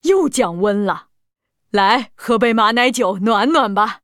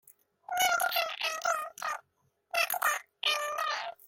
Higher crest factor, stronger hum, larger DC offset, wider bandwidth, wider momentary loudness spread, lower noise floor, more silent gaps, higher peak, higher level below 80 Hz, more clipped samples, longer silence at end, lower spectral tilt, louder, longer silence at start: about the same, 16 dB vs 18 dB; neither; neither; about the same, 16.5 kHz vs 16.5 kHz; second, 6 LU vs 10 LU; second, -71 dBFS vs -75 dBFS; neither; first, 0 dBFS vs -16 dBFS; first, -54 dBFS vs -76 dBFS; neither; about the same, 0.05 s vs 0.15 s; first, -4 dB/octave vs 2 dB/octave; first, -16 LUFS vs -30 LUFS; second, 0.05 s vs 0.5 s